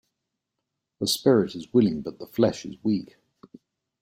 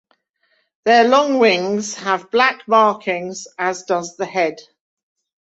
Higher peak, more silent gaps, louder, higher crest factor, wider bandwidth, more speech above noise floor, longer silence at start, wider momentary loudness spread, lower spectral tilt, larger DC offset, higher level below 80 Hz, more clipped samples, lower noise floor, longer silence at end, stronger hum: second, -6 dBFS vs -2 dBFS; neither; second, -25 LUFS vs -17 LUFS; about the same, 20 dB vs 18 dB; first, 16.5 kHz vs 8.2 kHz; first, 59 dB vs 48 dB; first, 1 s vs 0.85 s; about the same, 10 LU vs 10 LU; first, -5.5 dB/octave vs -3.5 dB/octave; neither; first, -62 dBFS vs -68 dBFS; neither; first, -83 dBFS vs -65 dBFS; about the same, 0.95 s vs 0.9 s; neither